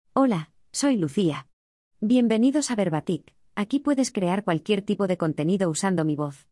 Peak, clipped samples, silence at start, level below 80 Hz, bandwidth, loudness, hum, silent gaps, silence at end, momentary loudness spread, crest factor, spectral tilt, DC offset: -8 dBFS; under 0.1%; 0.15 s; -66 dBFS; 12 kHz; -24 LUFS; none; 1.53-1.91 s; 0.15 s; 10 LU; 16 dB; -5.5 dB/octave; under 0.1%